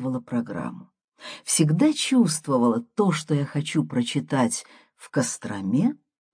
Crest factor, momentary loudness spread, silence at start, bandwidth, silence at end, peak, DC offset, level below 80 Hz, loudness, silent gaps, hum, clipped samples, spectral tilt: 18 dB; 12 LU; 0 s; 10.5 kHz; 0.4 s; -6 dBFS; under 0.1%; -70 dBFS; -24 LUFS; 1.04-1.08 s; none; under 0.1%; -5 dB/octave